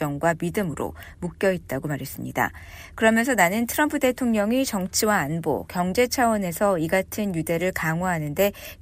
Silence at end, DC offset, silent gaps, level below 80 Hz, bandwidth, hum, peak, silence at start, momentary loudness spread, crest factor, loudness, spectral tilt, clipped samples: 0.05 s; under 0.1%; none; -48 dBFS; 15.5 kHz; none; -6 dBFS; 0 s; 10 LU; 18 dB; -23 LUFS; -4.5 dB/octave; under 0.1%